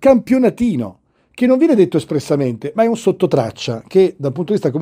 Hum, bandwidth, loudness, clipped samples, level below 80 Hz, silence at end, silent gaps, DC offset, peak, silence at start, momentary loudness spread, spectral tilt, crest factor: none; 15.5 kHz; -16 LUFS; under 0.1%; -50 dBFS; 0 s; none; under 0.1%; 0 dBFS; 0 s; 9 LU; -7 dB/octave; 14 dB